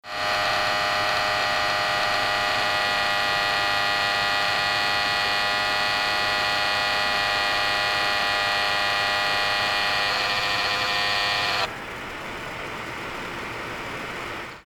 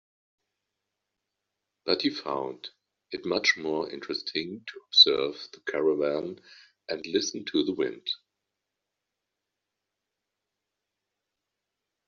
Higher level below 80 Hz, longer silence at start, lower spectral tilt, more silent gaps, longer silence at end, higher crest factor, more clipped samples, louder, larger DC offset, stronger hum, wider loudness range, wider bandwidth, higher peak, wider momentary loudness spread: first, -50 dBFS vs -74 dBFS; second, 0.05 s vs 1.85 s; about the same, -1.5 dB/octave vs -0.5 dB/octave; neither; second, 0.05 s vs 3.9 s; second, 14 dB vs 26 dB; neither; first, -22 LUFS vs -26 LUFS; neither; second, none vs 50 Hz at -70 dBFS; second, 4 LU vs 10 LU; first, over 20 kHz vs 7.2 kHz; second, -10 dBFS vs -4 dBFS; second, 10 LU vs 20 LU